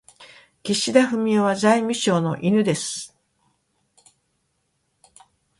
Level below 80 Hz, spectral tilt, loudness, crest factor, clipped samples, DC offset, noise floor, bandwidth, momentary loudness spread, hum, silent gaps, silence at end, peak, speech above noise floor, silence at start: -66 dBFS; -4.5 dB/octave; -20 LUFS; 20 dB; under 0.1%; under 0.1%; -71 dBFS; 11.5 kHz; 12 LU; none; none; 2.55 s; -2 dBFS; 52 dB; 0.2 s